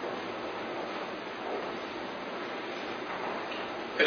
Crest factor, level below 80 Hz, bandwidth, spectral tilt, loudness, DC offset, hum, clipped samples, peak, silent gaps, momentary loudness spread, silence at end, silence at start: 22 dB; -70 dBFS; 6.6 kHz; -1 dB/octave; -37 LUFS; under 0.1%; none; under 0.1%; -12 dBFS; none; 2 LU; 0 s; 0 s